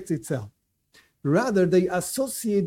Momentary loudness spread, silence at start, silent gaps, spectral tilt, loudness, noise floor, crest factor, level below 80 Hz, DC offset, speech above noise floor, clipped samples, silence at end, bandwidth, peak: 12 LU; 0 s; none; -6 dB/octave; -24 LUFS; -60 dBFS; 16 dB; -60 dBFS; under 0.1%; 37 dB; under 0.1%; 0 s; 17 kHz; -10 dBFS